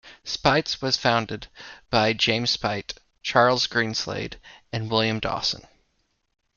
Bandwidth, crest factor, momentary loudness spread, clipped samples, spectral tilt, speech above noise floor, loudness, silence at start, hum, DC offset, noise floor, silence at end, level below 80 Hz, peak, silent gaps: 7.2 kHz; 22 dB; 15 LU; under 0.1%; -4 dB/octave; 47 dB; -23 LUFS; 0.05 s; none; under 0.1%; -71 dBFS; 0.95 s; -52 dBFS; -2 dBFS; none